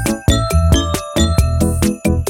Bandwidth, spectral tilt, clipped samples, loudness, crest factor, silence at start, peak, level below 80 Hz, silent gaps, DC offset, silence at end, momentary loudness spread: 17 kHz; -5.5 dB/octave; under 0.1%; -15 LUFS; 14 dB; 0 s; 0 dBFS; -20 dBFS; none; under 0.1%; 0 s; 3 LU